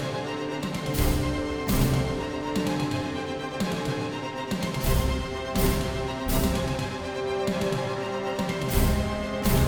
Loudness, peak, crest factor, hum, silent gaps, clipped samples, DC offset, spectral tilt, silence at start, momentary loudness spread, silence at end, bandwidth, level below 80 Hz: -28 LUFS; -8 dBFS; 18 dB; none; none; under 0.1%; under 0.1%; -5.5 dB/octave; 0 s; 6 LU; 0 s; over 20 kHz; -32 dBFS